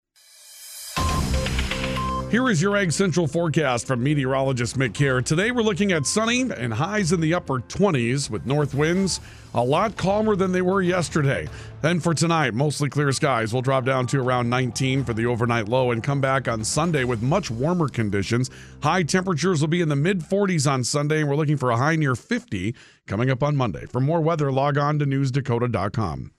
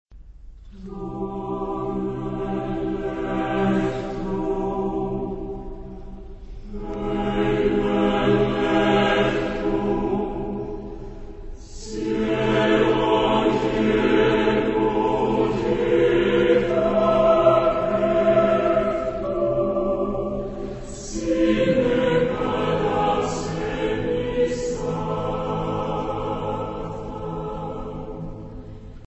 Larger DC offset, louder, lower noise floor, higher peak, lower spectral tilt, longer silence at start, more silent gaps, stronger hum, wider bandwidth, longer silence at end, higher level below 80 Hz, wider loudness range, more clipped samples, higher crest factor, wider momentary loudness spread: neither; about the same, -22 LUFS vs -22 LUFS; first, -50 dBFS vs -42 dBFS; about the same, -6 dBFS vs -4 dBFS; about the same, -5.5 dB/octave vs -6.5 dB/octave; first, 0.45 s vs 0.1 s; neither; neither; first, 14.5 kHz vs 8.4 kHz; about the same, 0.1 s vs 0.05 s; about the same, -40 dBFS vs -38 dBFS; second, 2 LU vs 8 LU; neither; about the same, 16 dB vs 18 dB; second, 5 LU vs 16 LU